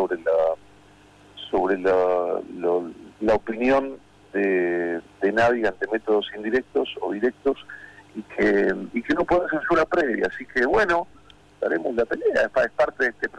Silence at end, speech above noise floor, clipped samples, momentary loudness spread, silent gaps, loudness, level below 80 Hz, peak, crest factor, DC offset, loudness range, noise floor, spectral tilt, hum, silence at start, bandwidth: 0 s; 29 dB; under 0.1%; 11 LU; none; -23 LUFS; -50 dBFS; -12 dBFS; 10 dB; under 0.1%; 2 LU; -52 dBFS; -6 dB/octave; 50 Hz at -60 dBFS; 0 s; 10 kHz